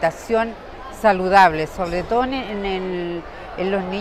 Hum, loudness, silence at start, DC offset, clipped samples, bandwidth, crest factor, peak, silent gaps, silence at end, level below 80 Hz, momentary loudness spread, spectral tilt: none; -20 LUFS; 0 s; under 0.1%; under 0.1%; 15 kHz; 18 dB; -2 dBFS; none; 0 s; -40 dBFS; 16 LU; -5.5 dB/octave